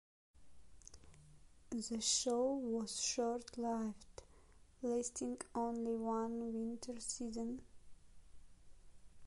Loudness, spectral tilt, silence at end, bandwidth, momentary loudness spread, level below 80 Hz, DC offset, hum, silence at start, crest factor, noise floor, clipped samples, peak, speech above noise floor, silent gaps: -40 LUFS; -3 dB/octave; 0 s; 11.5 kHz; 19 LU; -66 dBFS; under 0.1%; none; 0.35 s; 20 dB; -64 dBFS; under 0.1%; -24 dBFS; 23 dB; none